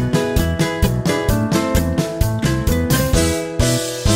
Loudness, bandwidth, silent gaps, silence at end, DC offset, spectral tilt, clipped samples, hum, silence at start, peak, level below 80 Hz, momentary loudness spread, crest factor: -18 LUFS; 16.5 kHz; none; 0 s; under 0.1%; -5 dB/octave; under 0.1%; none; 0 s; -2 dBFS; -24 dBFS; 3 LU; 16 dB